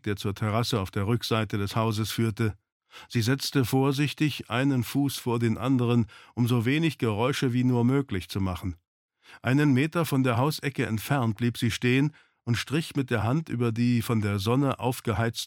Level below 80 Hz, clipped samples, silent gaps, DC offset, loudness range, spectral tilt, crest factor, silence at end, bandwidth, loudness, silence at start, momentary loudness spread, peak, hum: -58 dBFS; under 0.1%; 2.72-2.80 s, 8.87-9.08 s; under 0.1%; 2 LU; -6 dB/octave; 16 dB; 0 s; 17.5 kHz; -27 LUFS; 0.05 s; 6 LU; -10 dBFS; none